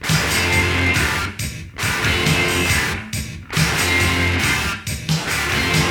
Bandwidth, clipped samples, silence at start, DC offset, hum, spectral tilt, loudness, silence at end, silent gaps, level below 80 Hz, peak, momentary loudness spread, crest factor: 20 kHz; under 0.1%; 0 s; under 0.1%; none; -3.5 dB/octave; -18 LUFS; 0 s; none; -32 dBFS; -2 dBFS; 9 LU; 16 dB